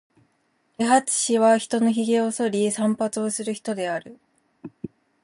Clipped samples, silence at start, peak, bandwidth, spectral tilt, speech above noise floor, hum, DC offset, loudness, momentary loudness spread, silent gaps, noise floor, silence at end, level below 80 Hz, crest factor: under 0.1%; 0.8 s; -4 dBFS; 11.5 kHz; -4 dB/octave; 46 dB; none; under 0.1%; -22 LUFS; 15 LU; none; -68 dBFS; 0.35 s; -72 dBFS; 18 dB